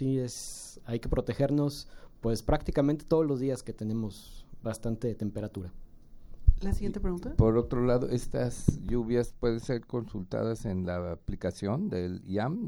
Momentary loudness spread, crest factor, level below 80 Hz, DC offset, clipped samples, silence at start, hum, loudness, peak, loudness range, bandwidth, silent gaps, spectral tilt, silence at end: 11 LU; 24 dB; -38 dBFS; under 0.1%; under 0.1%; 0 s; none; -31 LUFS; -6 dBFS; 5 LU; 16.5 kHz; none; -7 dB/octave; 0 s